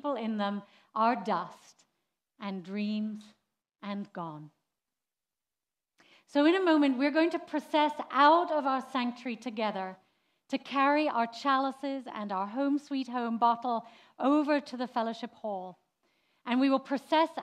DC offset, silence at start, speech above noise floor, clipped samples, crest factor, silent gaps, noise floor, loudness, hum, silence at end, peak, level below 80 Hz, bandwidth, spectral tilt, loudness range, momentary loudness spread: under 0.1%; 0.05 s; over 60 dB; under 0.1%; 20 dB; none; under -90 dBFS; -30 LUFS; none; 0 s; -10 dBFS; under -90 dBFS; 11 kHz; -5.5 dB/octave; 13 LU; 15 LU